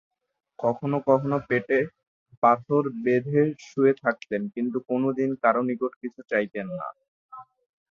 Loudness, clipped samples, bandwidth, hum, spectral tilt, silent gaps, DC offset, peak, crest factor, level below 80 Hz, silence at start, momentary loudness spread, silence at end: -25 LUFS; under 0.1%; 7.2 kHz; none; -8.5 dB/octave; 2.07-2.26 s, 2.37-2.42 s, 5.96-6.01 s, 7.08-7.29 s; under 0.1%; -6 dBFS; 20 dB; -68 dBFS; 0.6 s; 9 LU; 0.5 s